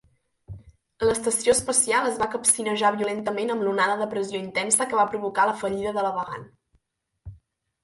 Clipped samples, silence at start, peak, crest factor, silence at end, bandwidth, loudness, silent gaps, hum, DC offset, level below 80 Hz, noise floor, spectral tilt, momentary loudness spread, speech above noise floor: under 0.1%; 0.5 s; -4 dBFS; 20 dB; 0.5 s; 12 kHz; -23 LUFS; none; none; under 0.1%; -56 dBFS; -73 dBFS; -2.5 dB/octave; 8 LU; 49 dB